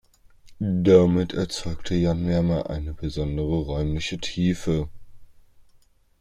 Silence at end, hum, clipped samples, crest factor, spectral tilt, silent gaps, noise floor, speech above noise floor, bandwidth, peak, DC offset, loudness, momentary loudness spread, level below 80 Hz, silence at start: 0.6 s; none; under 0.1%; 20 dB; -7 dB/octave; none; -58 dBFS; 35 dB; 11 kHz; -4 dBFS; under 0.1%; -24 LUFS; 14 LU; -40 dBFS; 0.45 s